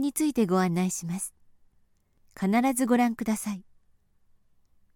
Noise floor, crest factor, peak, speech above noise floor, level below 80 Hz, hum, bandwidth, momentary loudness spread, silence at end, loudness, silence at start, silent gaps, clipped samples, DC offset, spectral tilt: -65 dBFS; 18 dB; -10 dBFS; 39 dB; -62 dBFS; none; 18 kHz; 11 LU; 1.35 s; -27 LUFS; 0 s; none; under 0.1%; under 0.1%; -5.5 dB/octave